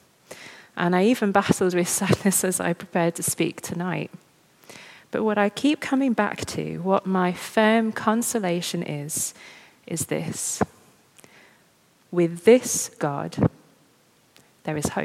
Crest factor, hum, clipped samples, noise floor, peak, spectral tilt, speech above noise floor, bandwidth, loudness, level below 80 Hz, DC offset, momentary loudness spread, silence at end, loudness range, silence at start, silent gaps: 22 dB; none; under 0.1%; -60 dBFS; -2 dBFS; -4.5 dB/octave; 37 dB; 16.5 kHz; -23 LUFS; -58 dBFS; under 0.1%; 12 LU; 0 s; 5 LU; 0.3 s; none